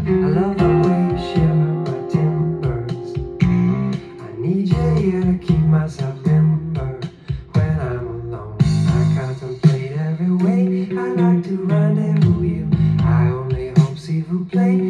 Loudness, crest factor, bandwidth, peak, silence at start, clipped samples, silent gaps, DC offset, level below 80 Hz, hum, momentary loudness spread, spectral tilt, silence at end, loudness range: -18 LUFS; 16 dB; 9.2 kHz; -2 dBFS; 0 s; under 0.1%; none; under 0.1%; -36 dBFS; none; 10 LU; -9 dB/octave; 0 s; 3 LU